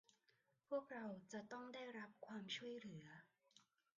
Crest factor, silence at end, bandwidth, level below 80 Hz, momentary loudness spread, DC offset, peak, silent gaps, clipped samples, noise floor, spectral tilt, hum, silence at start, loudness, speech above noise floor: 20 dB; 0.35 s; 7.4 kHz; under -90 dBFS; 9 LU; under 0.1%; -34 dBFS; none; under 0.1%; -83 dBFS; -3 dB/octave; none; 0.7 s; -53 LUFS; 30 dB